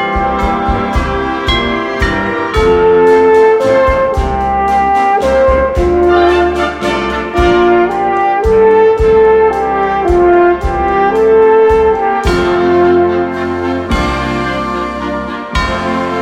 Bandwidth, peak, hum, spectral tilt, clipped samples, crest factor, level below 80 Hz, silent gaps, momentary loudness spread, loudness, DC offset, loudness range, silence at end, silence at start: 10.5 kHz; 0 dBFS; none; -6.5 dB/octave; under 0.1%; 10 dB; -24 dBFS; none; 8 LU; -11 LUFS; under 0.1%; 3 LU; 0 s; 0 s